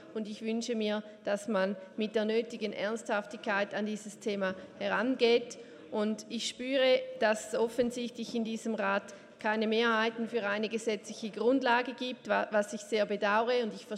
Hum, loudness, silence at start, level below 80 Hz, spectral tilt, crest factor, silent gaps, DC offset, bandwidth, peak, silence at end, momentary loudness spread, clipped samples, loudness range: none; -32 LUFS; 0 s; -76 dBFS; -4 dB/octave; 18 dB; none; under 0.1%; 13.5 kHz; -14 dBFS; 0 s; 9 LU; under 0.1%; 3 LU